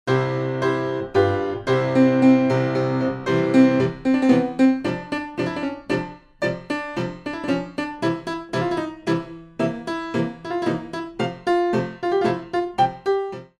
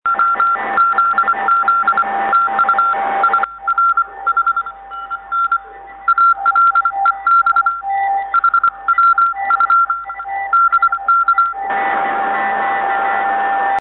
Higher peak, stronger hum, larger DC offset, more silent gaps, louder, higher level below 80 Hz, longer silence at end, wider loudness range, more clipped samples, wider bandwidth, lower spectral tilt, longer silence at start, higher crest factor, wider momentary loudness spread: about the same, -4 dBFS vs -4 dBFS; neither; neither; neither; second, -22 LUFS vs -14 LUFS; about the same, -54 dBFS vs -54 dBFS; first, 0.15 s vs 0 s; first, 8 LU vs 2 LU; neither; first, 10 kHz vs 4.2 kHz; first, -7 dB/octave vs -5.5 dB/octave; about the same, 0.05 s vs 0.05 s; first, 18 dB vs 12 dB; first, 11 LU vs 7 LU